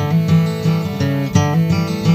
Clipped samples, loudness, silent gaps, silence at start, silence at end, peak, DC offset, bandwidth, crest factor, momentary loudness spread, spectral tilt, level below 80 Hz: under 0.1%; -16 LUFS; none; 0 s; 0 s; 0 dBFS; under 0.1%; 15 kHz; 14 dB; 4 LU; -7 dB/octave; -44 dBFS